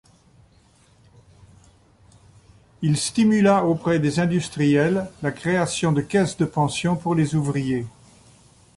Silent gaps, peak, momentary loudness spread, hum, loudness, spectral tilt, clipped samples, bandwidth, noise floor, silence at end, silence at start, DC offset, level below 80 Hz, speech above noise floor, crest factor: none; -6 dBFS; 8 LU; none; -21 LUFS; -6 dB/octave; under 0.1%; 11.5 kHz; -56 dBFS; 0.9 s; 2.8 s; under 0.1%; -54 dBFS; 36 dB; 16 dB